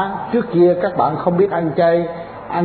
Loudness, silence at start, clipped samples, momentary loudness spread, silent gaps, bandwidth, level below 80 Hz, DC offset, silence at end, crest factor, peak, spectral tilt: -17 LUFS; 0 s; under 0.1%; 10 LU; none; 4.5 kHz; -52 dBFS; under 0.1%; 0 s; 14 dB; -4 dBFS; -12 dB/octave